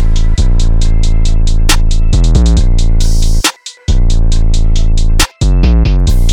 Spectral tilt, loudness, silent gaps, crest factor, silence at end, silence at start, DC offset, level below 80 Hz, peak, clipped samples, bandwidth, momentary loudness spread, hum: -4.5 dB/octave; -13 LUFS; none; 6 dB; 0 s; 0 s; under 0.1%; -8 dBFS; 0 dBFS; under 0.1%; 14 kHz; 4 LU; none